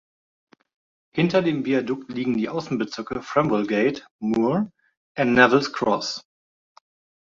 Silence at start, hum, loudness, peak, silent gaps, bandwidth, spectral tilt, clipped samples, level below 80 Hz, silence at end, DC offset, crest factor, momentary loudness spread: 1.15 s; none; -23 LUFS; 0 dBFS; 4.11-4.19 s, 4.97-5.15 s; 7.6 kHz; -6 dB/octave; under 0.1%; -60 dBFS; 1 s; under 0.1%; 22 dB; 13 LU